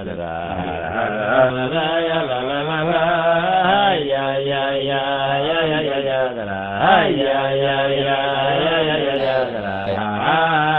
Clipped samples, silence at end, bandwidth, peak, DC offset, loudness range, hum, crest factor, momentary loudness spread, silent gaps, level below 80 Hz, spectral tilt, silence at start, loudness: under 0.1%; 0 s; 4.5 kHz; 0 dBFS; under 0.1%; 1 LU; none; 18 dB; 8 LU; none; -48 dBFS; -9 dB/octave; 0 s; -18 LUFS